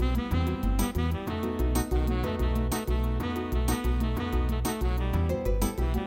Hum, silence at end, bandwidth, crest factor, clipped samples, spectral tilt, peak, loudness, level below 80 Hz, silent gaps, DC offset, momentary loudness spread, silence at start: none; 0 s; 17 kHz; 14 dB; under 0.1%; -6 dB/octave; -14 dBFS; -29 LUFS; -30 dBFS; none; under 0.1%; 2 LU; 0 s